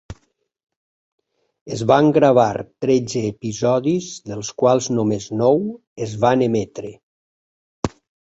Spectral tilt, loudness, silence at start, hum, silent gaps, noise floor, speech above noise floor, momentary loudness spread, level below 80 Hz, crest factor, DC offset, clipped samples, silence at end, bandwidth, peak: -6 dB/octave; -19 LUFS; 0.1 s; none; 0.76-1.18 s, 1.61-1.66 s, 5.87-5.96 s, 7.03-7.83 s; -63 dBFS; 45 dB; 15 LU; -52 dBFS; 18 dB; under 0.1%; under 0.1%; 0.4 s; 8.2 kHz; -2 dBFS